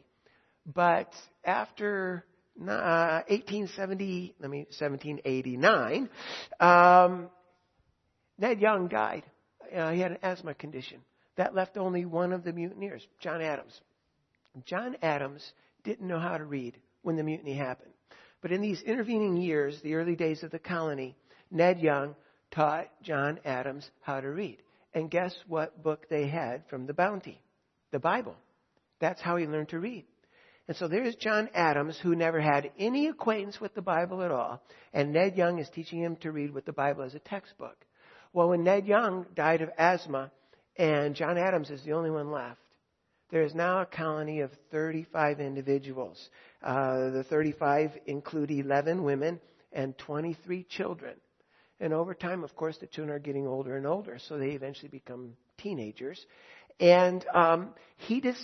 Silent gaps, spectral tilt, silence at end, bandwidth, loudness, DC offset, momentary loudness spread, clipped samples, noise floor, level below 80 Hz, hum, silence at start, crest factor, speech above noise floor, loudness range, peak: none; -7 dB/octave; 0 s; 6.4 kHz; -30 LUFS; under 0.1%; 15 LU; under 0.1%; -76 dBFS; -76 dBFS; none; 0.65 s; 26 dB; 47 dB; 10 LU; -6 dBFS